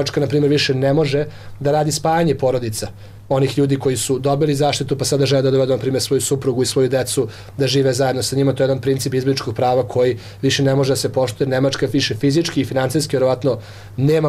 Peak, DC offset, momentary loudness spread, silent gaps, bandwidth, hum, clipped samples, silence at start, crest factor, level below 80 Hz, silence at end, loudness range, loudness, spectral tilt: -8 dBFS; under 0.1%; 6 LU; none; 15.5 kHz; none; under 0.1%; 0 s; 10 dB; -48 dBFS; 0 s; 1 LU; -18 LUFS; -5 dB/octave